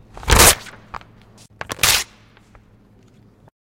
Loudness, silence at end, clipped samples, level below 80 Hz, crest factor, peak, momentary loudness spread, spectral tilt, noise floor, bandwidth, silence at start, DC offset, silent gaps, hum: -14 LUFS; 1.65 s; under 0.1%; -30 dBFS; 20 dB; 0 dBFS; 26 LU; -1.5 dB/octave; -51 dBFS; 17 kHz; 0.15 s; under 0.1%; none; none